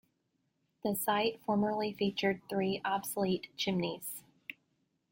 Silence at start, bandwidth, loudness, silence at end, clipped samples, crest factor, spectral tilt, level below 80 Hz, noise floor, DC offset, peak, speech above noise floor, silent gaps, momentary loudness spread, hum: 0.85 s; 17 kHz; -34 LUFS; 0.6 s; under 0.1%; 18 dB; -4.5 dB/octave; -72 dBFS; -79 dBFS; under 0.1%; -16 dBFS; 46 dB; none; 12 LU; none